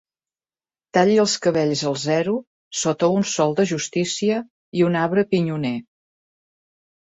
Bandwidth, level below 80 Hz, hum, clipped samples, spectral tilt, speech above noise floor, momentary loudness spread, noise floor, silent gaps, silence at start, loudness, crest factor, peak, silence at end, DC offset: 8.2 kHz; -64 dBFS; none; under 0.1%; -5 dB/octave; over 70 dB; 9 LU; under -90 dBFS; 2.47-2.71 s, 4.50-4.72 s; 0.95 s; -21 LUFS; 18 dB; -4 dBFS; 1.25 s; under 0.1%